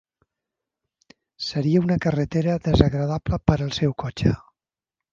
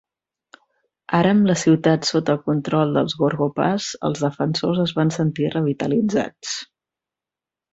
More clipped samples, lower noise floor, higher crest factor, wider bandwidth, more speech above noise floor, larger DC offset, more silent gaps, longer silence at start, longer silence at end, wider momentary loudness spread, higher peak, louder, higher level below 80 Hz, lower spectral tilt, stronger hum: neither; about the same, -88 dBFS vs -89 dBFS; about the same, 22 dB vs 18 dB; second, 7.4 kHz vs 8.2 kHz; about the same, 67 dB vs 69 dB; neither; neither; first, 1.4 s vs 1.1 s; second, 0.75 s vs 1.1 s; about the same, 6 LU vs 7 LU; about the same, -2 dBFS vs -2 dBFS; second, -23 LUFS vs -20 LUFS; first, -38 dBFS vs -58 dBFS; first, -7.5 dB/octave vs -6 dB/octave; neither